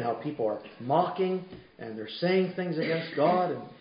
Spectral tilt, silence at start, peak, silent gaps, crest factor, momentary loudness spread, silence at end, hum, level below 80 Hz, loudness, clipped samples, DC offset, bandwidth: -10.5 dB/octave; 0 s; -10 dBFS; none; 18 dB; 13 LU; 0.05 s; none; -72 dBFS; -29 LUFS; under 0.1%; under 0.1%; 5.4 kHz